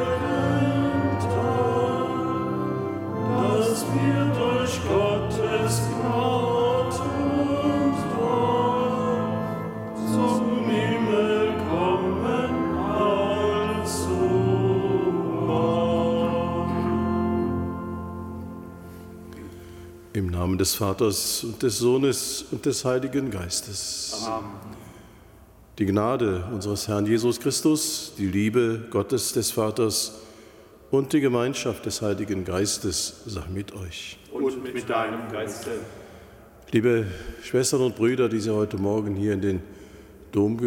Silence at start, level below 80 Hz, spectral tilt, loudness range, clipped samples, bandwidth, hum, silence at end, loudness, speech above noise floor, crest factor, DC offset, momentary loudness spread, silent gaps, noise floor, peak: 0 s; -50 dBFS; -5 dB/octave; 5 LU; under 0.1%; 17 kHz; none; 0 s; -24 LUFS; 25 dB; 16 dB; under 0.1%; 11 LU; none; -50 dBFS; -10 dBFS